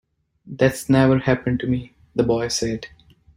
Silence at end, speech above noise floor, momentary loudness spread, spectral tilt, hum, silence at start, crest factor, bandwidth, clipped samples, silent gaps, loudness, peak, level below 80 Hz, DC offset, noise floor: 0.5 s; 23 dB; 13 LU; -6 dB/octave; none; 0.45 s; 18 dB; 16 kHz; under 0.1%; none; -21 LUFS; -4 dBFS; -46 dBFS; under 0.1%; -43 dBFS